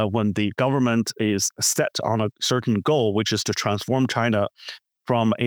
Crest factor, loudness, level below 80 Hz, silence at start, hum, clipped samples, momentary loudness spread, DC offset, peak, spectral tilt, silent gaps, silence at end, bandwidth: 16 dB; -22 LUFS; -62 dBFS; 0 s; none; under 0.1%; 4 LU; under 0.1%; -6 dBFS; -4.5 dB/octave; none; 0 s; over 20 kHz